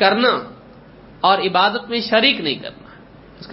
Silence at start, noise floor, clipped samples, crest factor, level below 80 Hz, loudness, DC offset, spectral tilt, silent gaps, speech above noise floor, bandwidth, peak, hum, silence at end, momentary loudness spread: 0 s; -43 dBFS; under 0.1%; 20 dB; -54 dBFS; -17 LUFS; under 0.1%; -8.5 dB/octave; none; 26 dB; 5.8 kHz; 0 dBFS; none; 0 s; 12 LU